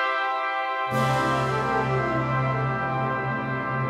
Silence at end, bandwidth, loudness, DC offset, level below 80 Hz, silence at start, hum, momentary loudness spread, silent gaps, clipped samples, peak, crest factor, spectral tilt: 0 s; 13.5 kHz; -25 LUFS; under 0.1%; -50 dBFS; 0 s; none; 4 LU; none; under 0.1%; -12 dBFS; 12 dB; -6.5 dB/octave